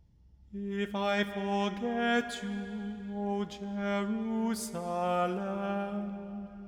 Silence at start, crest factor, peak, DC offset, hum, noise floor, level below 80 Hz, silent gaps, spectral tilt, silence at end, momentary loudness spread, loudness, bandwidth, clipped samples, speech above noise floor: 0.25 s; 18 dB; -16 dBFS; under 0.1%; none; -59 dBFS; -62 dBFS; none; -5.5 dB/octave; 0 s; 9 LU; -33 LUFS; 15.5 kHz; under 0.1%; 27 dB